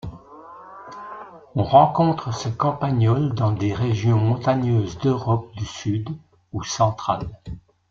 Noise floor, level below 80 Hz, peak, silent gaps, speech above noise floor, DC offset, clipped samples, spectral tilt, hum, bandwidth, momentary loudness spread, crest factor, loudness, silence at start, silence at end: -43 dBFS; -48 dBFS; -2 dBFS; none; 22 dB; under 0.1%; under 0.1%; -7 dB/octave; none; 7.4 kHz; 21 LU; 20 dB; -21 LUFS; 0.05 s; 0.3 s